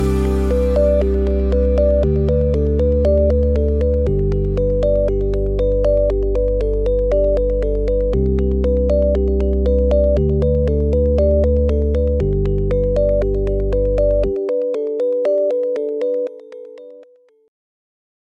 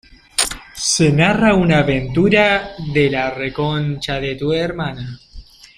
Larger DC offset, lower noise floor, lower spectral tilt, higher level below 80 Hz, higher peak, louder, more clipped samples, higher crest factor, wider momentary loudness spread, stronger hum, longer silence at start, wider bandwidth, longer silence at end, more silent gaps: neither; first, -48 dBFS vs -38 dBFS; first, -10 dB/octave vs -4.5 dB/octave; first, -20 dBFS vs -38 dBFS; second, -4 dBFS vs 0 dBFS; about the same, -17 LUFS vs -17 LUFS; neither; second, 12 dB vs 18 dB; second, 5 LU vs 10 LU; neither; second, 0 s vs 0.4 s; second, 5.8 kHz vs 15.5 kHz; first, 1.3 s vs 0.35 s; neither